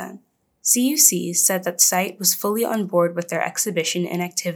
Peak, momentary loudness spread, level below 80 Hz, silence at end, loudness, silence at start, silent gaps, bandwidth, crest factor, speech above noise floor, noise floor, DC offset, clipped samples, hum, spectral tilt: 0 dBFS; 10 LU; -84 dBFS; 0 s; -19 LUFS; 0 s; none; over 20 kHz; 20 dB; 29 dB; -50 dBFS; under 0.1%; under 0.1%; none; -2.5 dB/octave